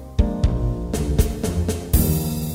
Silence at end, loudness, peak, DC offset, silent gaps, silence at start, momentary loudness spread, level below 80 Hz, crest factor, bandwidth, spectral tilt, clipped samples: 0 s; -22 LUFS; -2 dBFS; under 0.1%; none; 0 s; 5 LU; -24 dBFS; 18 dB; 16.5 kHz; -6 dB/octave; under 0.1%